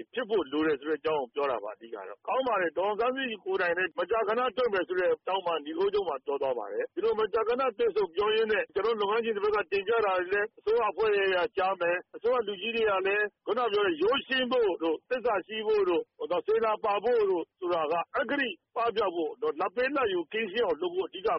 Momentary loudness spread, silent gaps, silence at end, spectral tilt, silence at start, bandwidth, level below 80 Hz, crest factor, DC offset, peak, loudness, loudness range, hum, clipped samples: 5 LU; none; 0 s; -1 dB/octave; 0 s; 5.8 kHz; -66 dBFS; 12 dB; under 0.1%; -18 dBFS; -29 LUFS; 2 LU; none; under 0.1%